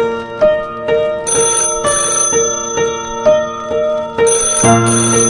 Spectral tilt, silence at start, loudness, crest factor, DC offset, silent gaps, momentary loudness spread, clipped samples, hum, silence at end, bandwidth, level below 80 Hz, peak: -3 dB/octave; 0 s; -13 LUFS; 14 dB; under 0.1%; none; 7 LU; under 0.1%; none; 0 s; 11.5 kHz; -40 dBFS; 0 dBFS